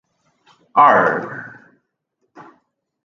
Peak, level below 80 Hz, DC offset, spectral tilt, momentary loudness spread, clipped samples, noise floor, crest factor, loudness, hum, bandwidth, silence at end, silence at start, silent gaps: 0 dBFS; -68 dBFS; under 0.1%; -6.5 dB/octave; 22 LU; under 0.1%; -72 dBFS; 20 dB; -14 LUFS; none; 6.8 kHz; 1.55 s; 0.75 s; none